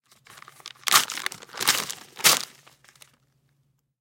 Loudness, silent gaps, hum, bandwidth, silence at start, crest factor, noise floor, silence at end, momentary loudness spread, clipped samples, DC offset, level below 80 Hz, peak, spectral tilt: -22 LUFS; none; none; 17 kHz; 0.65 s; 26 dB; -70 dBFS; 1.55 s; 19 LU; under 0.1%; under 0.1%; -72 dBFS; -2 dBFS; 1 dB/octave